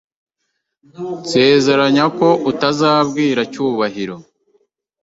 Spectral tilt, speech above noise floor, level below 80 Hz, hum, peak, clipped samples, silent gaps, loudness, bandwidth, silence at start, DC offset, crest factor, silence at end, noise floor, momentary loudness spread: -5 dB/octave; 58 dB; -58 dBFS; none; 0 dBFS; under 0.1%; none; -15 LUFS; 8 kHz; 1 s; under 0.1%; 16 dB; 0.8 s; -73 dBFS; 15 LU